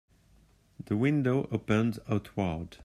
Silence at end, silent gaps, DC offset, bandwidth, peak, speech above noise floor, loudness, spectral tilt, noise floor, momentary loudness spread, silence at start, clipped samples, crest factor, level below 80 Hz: 0 s; none; under 0.1%; 13.5 kHz; -12 dBFS; 33 dB; -30 LUFS; -8 dB/octave; -63 dBFS; 7 LU; 0.8 s; under 0.1%; 20 dB; -58 dBFS